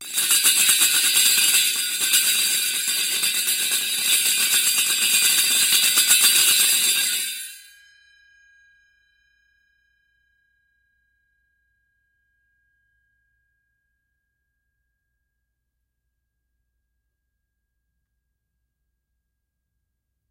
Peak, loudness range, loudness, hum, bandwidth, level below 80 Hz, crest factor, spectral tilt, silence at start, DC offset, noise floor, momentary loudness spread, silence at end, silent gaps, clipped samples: 0 dBFS; 7 LU; -16 LUFS; none; 16 kHz; -76 dBFS; 24 dB; 3.5 dB/octave; 0 s; under 0.1%; -79 dBFS; 6 LU; 12.7 s; none; under 0.1%